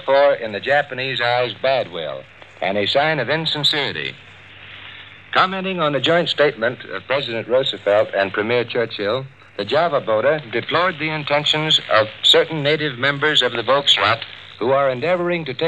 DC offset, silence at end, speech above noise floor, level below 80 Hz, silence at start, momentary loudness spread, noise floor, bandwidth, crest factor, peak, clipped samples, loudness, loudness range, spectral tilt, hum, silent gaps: 0.2%; 0 s; 21 dB; -64 dBFS; 0 s; 12 LU; -40 dBFS; 12 kHz; 18 dB; -2 dBFS; under 0.1%; -18 LUFS; 4 LU; -4 dB/octave; none; none